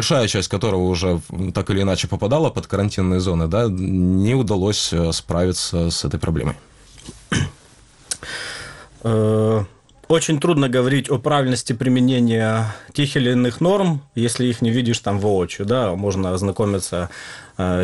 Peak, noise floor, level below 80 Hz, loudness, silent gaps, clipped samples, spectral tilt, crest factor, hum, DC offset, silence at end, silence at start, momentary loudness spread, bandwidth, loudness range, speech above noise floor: -4 dBFS; -49 dBFS; -40 dBFS; -20 LUFS; none; under 0.1%; -5.5 dB/octave; 16 dB; none; 0.1%; 0 s; 0 s; 10 LU; 12 kHz; 5 LU; 30 dB